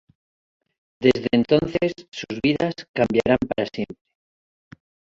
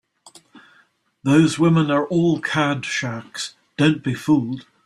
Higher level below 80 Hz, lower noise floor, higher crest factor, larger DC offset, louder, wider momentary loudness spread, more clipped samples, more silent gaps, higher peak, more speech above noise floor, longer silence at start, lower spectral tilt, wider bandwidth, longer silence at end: first, -50 dBFS vs -58 dBFS; first, under -90 dBFS vs -59 dBFS; first, 22 dB vs 16 dB; neither; about the same, -22 LUFS vs -20 LUFS; about the same, 12 LU vs 13 LU; neither; first, 2.08-2.12 s, 2.88-2.94 s vs none; about the same, -2 dBFS vs -4 dBFS; first, over 69 dB vs 40 dB; first, 1 s vs 0.55 s; about the same, -6.5 dB/octave vs -6 dB/octave; second, 7.6 kHz vs 12.5 kHz; first, 1.2 s vs 0.25 s